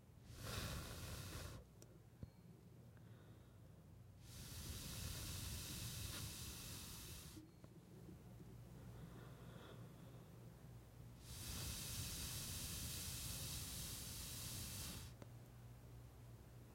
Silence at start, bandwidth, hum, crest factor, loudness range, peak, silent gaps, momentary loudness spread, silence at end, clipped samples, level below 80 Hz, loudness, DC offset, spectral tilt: 0 s; 16.5 kHz; none; 18 dB; 12 LU; -36 dBFS; none; 16 LU; 0 s; under 0.1%; -62 dBFS; -51 LUFS; under 0.1%; -3 dB/octave